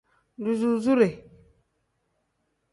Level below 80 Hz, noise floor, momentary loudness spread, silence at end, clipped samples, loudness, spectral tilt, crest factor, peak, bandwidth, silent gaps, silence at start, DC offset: -66 dBFS; -75 dBFS; 12 LU; 1.55 s; under 0.1%; -24 LUFS; -7 dB/octave; 20 dB; -8 dBFS; 11.5 kHz; none; 0.4 s; under 0.1%